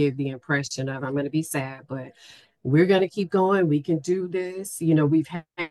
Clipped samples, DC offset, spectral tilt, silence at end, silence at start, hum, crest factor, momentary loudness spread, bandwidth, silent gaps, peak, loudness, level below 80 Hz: under 0.1%; under 0.1%; -6.5 dB/octave; 0 s; 0 s; none; 16 dB; 13 LU; 12.5 kHz; none; -8 dBFS; -24 LUFS; -68 dBFS